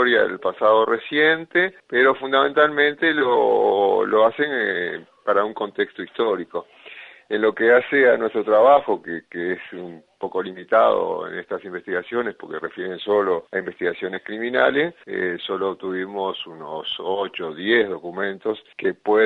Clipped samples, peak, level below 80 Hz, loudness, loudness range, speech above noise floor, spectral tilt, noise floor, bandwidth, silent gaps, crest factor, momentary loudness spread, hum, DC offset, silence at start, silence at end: under 0.1%; -2 dBFS; -68 dBFS; -21 LUFS; 6 LU; 22 dB; -6.5 dB/octave; -43 dBFS; 4.4 kHz; none; 18 dB; 13 LU; none; under 0.1%; 0 s; 0 s